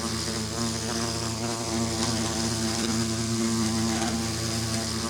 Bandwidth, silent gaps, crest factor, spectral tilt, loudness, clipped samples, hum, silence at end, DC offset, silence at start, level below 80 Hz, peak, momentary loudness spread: 19.5 kHz; none; 16 dB; -3.5 dB/octave; -27 LUFS; under 0.1%; none; 0 s; under 0.1%; 0 s; -48 dBFS; -10 dBFS; 3 LU